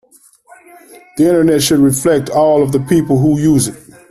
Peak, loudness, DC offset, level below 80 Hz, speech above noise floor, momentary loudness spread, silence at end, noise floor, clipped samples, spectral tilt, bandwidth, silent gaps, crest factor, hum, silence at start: 0 dBFS; -12 LUFS; under 0.1%; -44 dBFS; 36 dB; 4 LU; 0.35 s; -47 dBFS; under 0.1%; -5.5 dB/octave; 14 kHz; none; 12 dB; none; 1.15 s